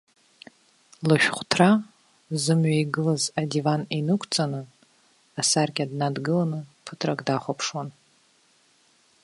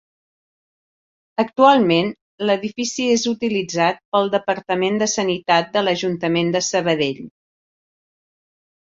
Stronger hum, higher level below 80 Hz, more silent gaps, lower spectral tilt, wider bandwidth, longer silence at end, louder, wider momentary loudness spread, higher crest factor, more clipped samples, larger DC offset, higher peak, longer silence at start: neither; second, -68 dBFS vs -62 dBFS; second, none vs 2.21-2.38 s, 4.05-4.12 s; about the same, -4.5 dB/octave vs -4 dB/octave; first, 11.5 kHz vs 7.8 kHz; second, 1.35 s vs 1.55 s; second, -24 LUFS vs -19 LUFS; first, 13 LU vs 9 LU; first, 24 dB vs 18 dB; neither; neither; about the same, -2 dBFS vs -2 dBFS; second, 1 s vs 1.4 s